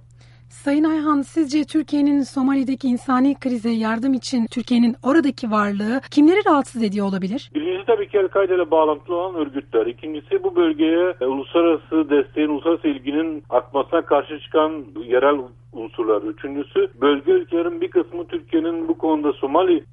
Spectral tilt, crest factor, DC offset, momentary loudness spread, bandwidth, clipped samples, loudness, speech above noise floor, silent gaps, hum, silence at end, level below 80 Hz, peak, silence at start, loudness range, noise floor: -6 dB/octave; 16 dB; under 0.1%; 7 LU; 11.5 kHz; under 0.1%; -20 LUFS; 28 dB; none; none; 0.1 s; -56 dBFS; -4 dBFS; 0.55 s; 3 LU; -47 dBFS